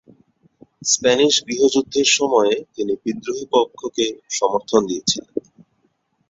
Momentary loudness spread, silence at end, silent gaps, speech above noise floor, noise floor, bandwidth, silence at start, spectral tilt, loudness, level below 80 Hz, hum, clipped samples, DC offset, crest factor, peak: 10 LU; 0.9 s; none; 47 dB; -66 dBFS; 8 kHz; 0.8 s; -2 dB/octave; -19 LUFS; -60 dBFS; none; under 0.1%; under 0.1%; 18 dB; -2 dBFS